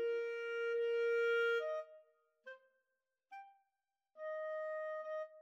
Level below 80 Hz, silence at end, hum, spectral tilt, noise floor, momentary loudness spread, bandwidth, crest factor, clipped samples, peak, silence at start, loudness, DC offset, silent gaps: under -90 dBFS; 0 s; none; 0 dB/octave; under -90 dBFS; 22 LU; 7.4 kHz; 14 dB; under 0.1%; -26 dBFS; 0 s; -39 LUFS; under 0.1%; none